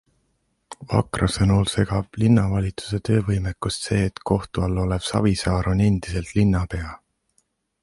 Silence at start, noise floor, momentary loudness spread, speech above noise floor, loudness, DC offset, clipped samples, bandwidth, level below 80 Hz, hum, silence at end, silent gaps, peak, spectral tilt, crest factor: 0.7 s; -70 dBFS; 8 LU; 49 dB; -22 LUFS; under 0.1%; under 0.1%; 11.5 kHz; -36 dBFS; none; 0.85 s; none; -4 dBFS; -6.5 dB/octave; 18 dB